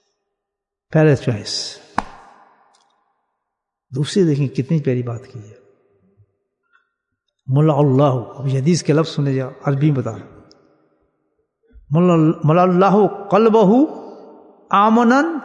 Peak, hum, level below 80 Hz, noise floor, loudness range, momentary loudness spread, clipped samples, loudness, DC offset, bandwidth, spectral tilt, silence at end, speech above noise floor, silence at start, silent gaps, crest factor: 0 dBFS; none; -56 dBFS; -82 dBFS; 8 LU; 14 LU; under 0.1%; -16 LUFS; under 0.1%; 10.5 kHz; -7 dB/octave; 0 s; 67 dB; 0.9 s; none; 18 dB